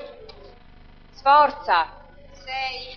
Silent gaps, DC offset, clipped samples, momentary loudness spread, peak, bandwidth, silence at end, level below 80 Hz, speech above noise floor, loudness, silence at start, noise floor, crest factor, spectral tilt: none; under 0.1%; under 0.1%; 20 LU; -4 dBFS; 6.4 kHz; 0 s; -48 dBFS; 27 dB; -21 LUFS; 0 s; -47 dBFS; 20 dB; -3.5 dB/octave